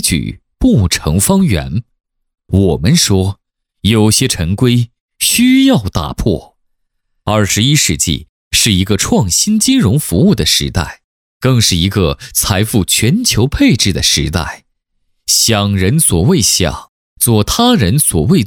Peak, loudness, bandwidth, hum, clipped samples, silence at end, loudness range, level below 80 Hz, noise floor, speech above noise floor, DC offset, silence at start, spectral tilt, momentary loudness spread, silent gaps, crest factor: 0 dBFS; -11 LUFS; 19 kHz; none; under 0.1%; 0 s; 2 LU; -30 dBFS; -65 dBFS; 54 dB; under 0.1%; 0 s; -4 dB/octave; 9 LU; 5.00-5.08 s, 8.29-8.51 s, 11.04-11.40 s, 16.89-17.16 s; 12 dB